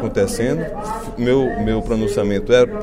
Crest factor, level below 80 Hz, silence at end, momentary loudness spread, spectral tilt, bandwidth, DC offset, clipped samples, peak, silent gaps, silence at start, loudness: 16 dB; -32 dBFS; 0 s; 9 LU; -6 dB/octave; 15.5 kHz; under 0.1%; under 0.1%; -2 dBFS; none; 0 s; -19 LUFS